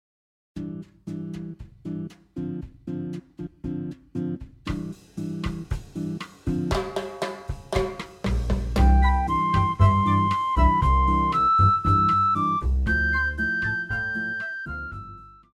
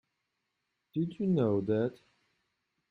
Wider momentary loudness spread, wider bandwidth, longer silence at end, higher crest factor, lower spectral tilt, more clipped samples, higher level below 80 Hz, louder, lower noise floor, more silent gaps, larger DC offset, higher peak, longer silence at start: first, 17 LU vs 8 LU; first, 10.5 kHz vs 5 kHz; second, 0.25 s vs 0.95 s; about the same, 18 dB vs 18 dB; second, -7 dB/octave vs -10 dB/octave; neither; first, -30 dBFS vs -72 dBFS; first, -24 LUFS vs -32 LUFS; second, -44 dBFS vs -83 dBFS; neither; neither; first, -6 dBFS vs -16 dBFS; second, 0.55 s vs 0.95 s